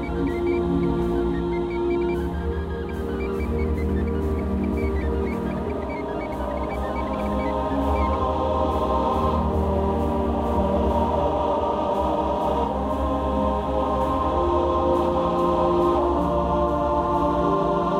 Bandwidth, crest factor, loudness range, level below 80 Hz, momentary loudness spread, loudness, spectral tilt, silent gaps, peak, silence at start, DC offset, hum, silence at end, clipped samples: 12.5 kHz; 14 dB; 4 LU; -30 dBFS; 6 LU; -23 LUFS; -8.5 dB/octave; none; -8 dBFS; 0 s; under 0.1%; none; 0 s; under 0.1%